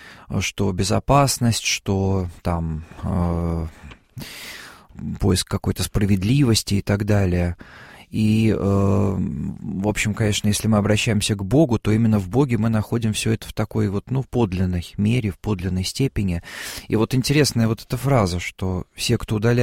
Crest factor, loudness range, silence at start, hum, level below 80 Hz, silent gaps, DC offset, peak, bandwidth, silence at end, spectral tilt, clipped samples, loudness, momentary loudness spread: 18 dB; 5 LU; 0 s; none; -38 dBFS; none; 0.1%; -4 dBFS; 16.5 kHz; 0 s; -5.5 dB/octave; under 0.1%; -21 LUFS; 11 LU